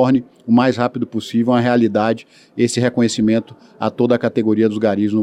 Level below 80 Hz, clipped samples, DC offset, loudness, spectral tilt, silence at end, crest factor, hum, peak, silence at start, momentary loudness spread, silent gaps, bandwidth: -58 dBFS; under 0.1%; under 0.1%; -17 LUFS; -6 dB/octave; 0 s; 16 dB; none; 0 dBFS; 0 s; 7 LU; none; 11 kHz